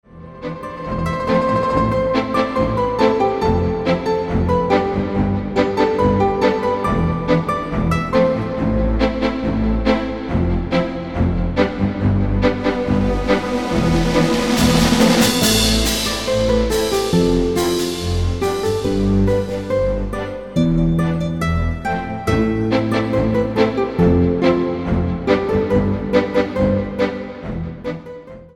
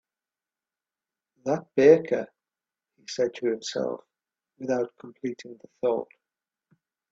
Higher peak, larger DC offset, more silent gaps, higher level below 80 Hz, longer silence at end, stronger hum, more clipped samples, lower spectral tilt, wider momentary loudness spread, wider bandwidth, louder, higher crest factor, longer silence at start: first, -2 dBFS vs -6 dBFS; first, 0.3% vs under 0.1%; neither; first, -28 dBFS vs -72 dBFS; second, 0.05 s vs 1.05 s; neither; neither; about the same, -5.5 dB/octave vs -5.5 dB/octave; second, 7 LU vs 23 LU; first, 17 kHz vs 7.8 kHz; first, -18 LUFS vs -26 LUFS; second, 16 dB vs 24 dB; second, 0.1 s vs 1.45 s